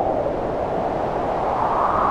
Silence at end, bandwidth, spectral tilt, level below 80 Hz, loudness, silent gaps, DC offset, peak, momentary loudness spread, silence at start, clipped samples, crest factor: 0 s; 11 kHz; -7.5 dB/octave; -40 dBFS; -22 LUFS; none; under 0.1%; -8 dBFS; 4 LU; 0 s; under 0.1%; 14 dB